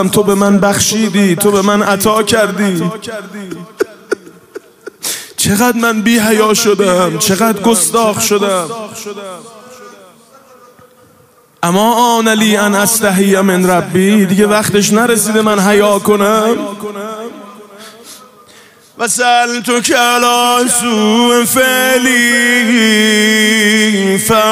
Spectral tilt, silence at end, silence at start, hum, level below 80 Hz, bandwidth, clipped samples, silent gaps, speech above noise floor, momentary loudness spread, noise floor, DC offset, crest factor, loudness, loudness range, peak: -3.5 dB/octave; 0 s; 0 s; none; -50 dBFS; 16 kHz; under 0.1%; none; 36 dB; 14 LU; -46 dBFS; under 0.1%; 12 dB; -10 LUFS; 8 LU; 0 dBFS